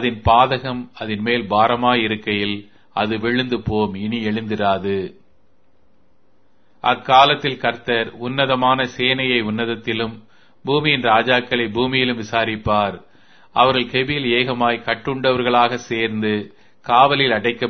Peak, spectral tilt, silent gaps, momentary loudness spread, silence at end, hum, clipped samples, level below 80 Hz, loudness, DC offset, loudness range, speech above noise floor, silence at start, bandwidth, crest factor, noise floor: 0 dBFS; -6 dB/octave; none; 10 LU; 0 s; none; under 0.1%; -46 dBFS; -18 LUFS; 0.4%; 5 LU; 43 dB; 0 s; 6.6 kHz; 20 dB; -62 dBFS